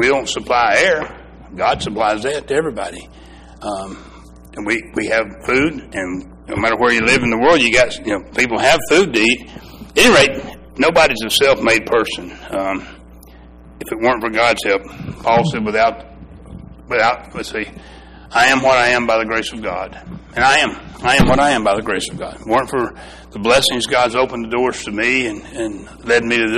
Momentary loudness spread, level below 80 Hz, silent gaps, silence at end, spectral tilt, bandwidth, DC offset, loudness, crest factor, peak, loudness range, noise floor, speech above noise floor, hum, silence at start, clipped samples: 16 LU; -38 dBFS; none; 0 s; -3.5 dB/octave; 15.5 kHz; under 0.1%; -15 LUFS; 16 dB; 0 dBFS; 7 LU; -40 dBFS; 24 dB; none; 0 s; under 0.1%